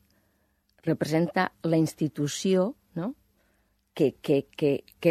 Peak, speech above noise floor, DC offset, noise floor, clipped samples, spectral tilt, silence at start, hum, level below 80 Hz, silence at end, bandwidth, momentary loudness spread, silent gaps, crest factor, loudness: -8 dBFS; 44 dB; under 0.1%; -70 dBFS; under 0.1%; -6 dB/octave; 0.85 s; none; -68 dBFS; 0 s; 14 kHz; 10 LU; none; 20 dB; -27 LUFS